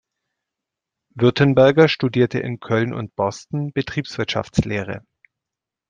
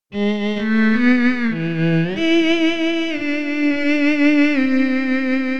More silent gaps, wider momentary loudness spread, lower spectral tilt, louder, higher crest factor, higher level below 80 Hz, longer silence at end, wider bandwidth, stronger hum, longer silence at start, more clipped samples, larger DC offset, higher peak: neither; first, 13 LU vs 6 LU; about the same, -6.5 dB/octave vs -6.5 dB/octave; about the same, -19 LUFS vs -17 LUFS; first, 18 dB vs 12 dB; first, -48 dBFS vs -56 dBFS; first, 0.9 s vs 0 s; first, 9.2 kHz vs 8 kHz; neither; first, 1.15 s vs 0 s; neither; second, under 0.1% vs 3%; about the same, -2 dBFS vs -4 dBFS